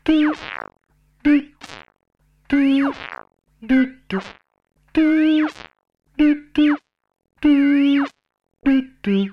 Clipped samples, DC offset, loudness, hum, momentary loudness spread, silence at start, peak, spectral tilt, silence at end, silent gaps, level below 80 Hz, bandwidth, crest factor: under 0.1%; under 0.1%; -19 LUFS; none; 19 LU; 0.05 s; -6 dBFS; -7 dB/octave; 0 s; none; -48 dBFS; 6.6 kHz; 14 dB